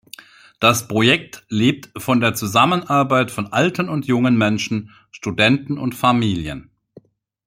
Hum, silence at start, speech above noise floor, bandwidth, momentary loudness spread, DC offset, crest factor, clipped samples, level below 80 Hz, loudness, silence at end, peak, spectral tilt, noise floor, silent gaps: none; 0.6 s; 31 dB; 16.5 kHz; 10 LU; under 0.1%; 18 dB; under 0.1%; -52 dBFS; -18 LUFS; 0.85 s; -2 dBFS; -5 dB/octave; -49 dBFS; none